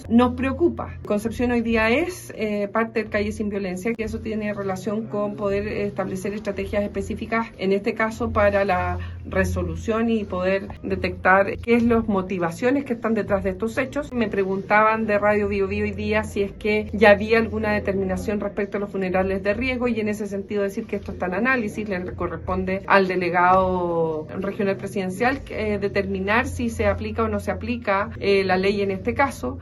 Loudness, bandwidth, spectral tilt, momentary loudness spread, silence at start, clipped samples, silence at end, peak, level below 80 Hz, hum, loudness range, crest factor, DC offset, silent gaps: -23 LUFS; 12.5 kHz; -6.5 dB/octave; 9 LU; 0 s; under 0.1%; 0 s; 0 dBFS; -42 dBFS; none; 5 LU; 22 dB; under 0.1%; none